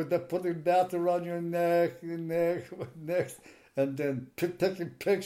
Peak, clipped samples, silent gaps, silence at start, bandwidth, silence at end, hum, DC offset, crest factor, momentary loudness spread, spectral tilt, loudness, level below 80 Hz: -14 dBFS; under 0.1%; none; 0 s; 16.5 kHz; 0 s; none; under 0.1%; 16 dB; 11 LU; -6.5 dB/octave; -31 LUFS; -72 dBFS